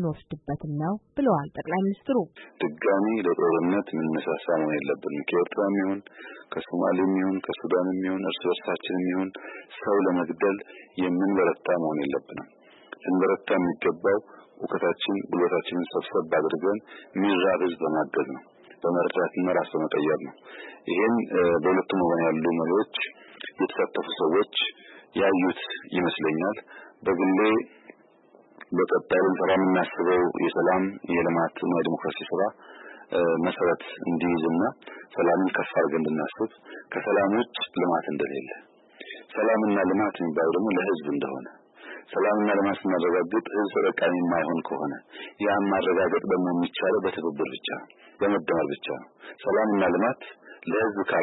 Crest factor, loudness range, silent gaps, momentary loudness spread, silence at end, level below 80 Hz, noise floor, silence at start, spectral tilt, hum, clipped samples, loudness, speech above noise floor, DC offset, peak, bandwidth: 14 dB; 2 LU; none; 12 LU; 0 s; -66 dBFS; -57 dBFS; 0 s; -10.5 dB/octave; none; under 0.1%; -26 LUFS; 31 dB; under 0.1%; -12 dBFS; 4.1 kHz